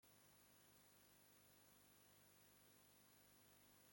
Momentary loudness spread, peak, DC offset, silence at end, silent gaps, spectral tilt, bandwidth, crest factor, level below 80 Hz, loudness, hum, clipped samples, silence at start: 0 LU; -56 dBFS; under 0.1%; 0 s; none; -2.5 dB/octave; 16.5 kHz; 16 dB; under -90 dBFS; -70 LUFS; 50 Hz at -85 dBFS; under 0.1%; 0 s